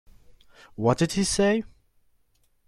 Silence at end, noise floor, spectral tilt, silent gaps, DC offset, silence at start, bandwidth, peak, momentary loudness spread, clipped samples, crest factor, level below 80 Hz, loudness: 1 s; -66 dBFS; -5 dB/octave; none; under 0.1%; 0.8 s; 13.5 kHz; -8 dBFS; 19 LU; under 0.1%; 20 dB; -50 dBFS; -24 LUFS